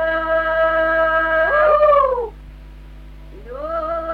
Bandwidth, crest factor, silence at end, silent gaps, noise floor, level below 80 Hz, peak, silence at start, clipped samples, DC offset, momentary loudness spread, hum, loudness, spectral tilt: 5 kHz; 14 dB; 0 s; none; -37 dBFS; -38 dBFS; -4 dBFS; 0 s; under 0.1%; under 0.1%; 14 LU; 50 Hz at -35 dBFS; -16 LUFS; -6 dB/octave